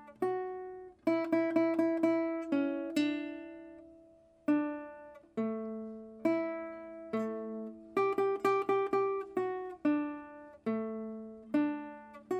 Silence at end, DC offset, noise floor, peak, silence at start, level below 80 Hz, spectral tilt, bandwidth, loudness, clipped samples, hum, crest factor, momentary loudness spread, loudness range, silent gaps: 0 s; under 0.1%; -61 dBFS; -18 dBFS; 0 s; -76 dBFS; -6.5 dB/octave; 14 kHz; -34 LUFS; under 0.1%; none; 18 dB; 16 LU; 5 LU; none